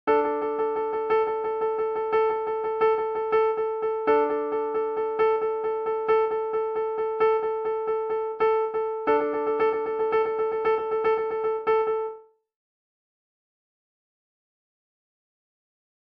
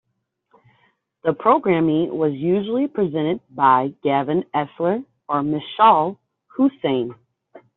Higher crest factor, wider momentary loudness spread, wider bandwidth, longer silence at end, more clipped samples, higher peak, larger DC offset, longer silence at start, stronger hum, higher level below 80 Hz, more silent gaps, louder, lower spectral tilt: about the same, 16 dB vs 18 dB; second, 4 LU vs 9 LU; first, 5.2 kHz vs 4.1 kHz; first, 3.8 s vs 0.2 s; neither; second, -10 dBFS vs -2 dBFS; neither; second, 0.05 s vs 1.25 s; neither; about the same, -64 dBFS vs -64 dBFS; neither; second, -25 LUFS vs -20 LUFS; first, -7 dB/octave vs -5.5 dB/octave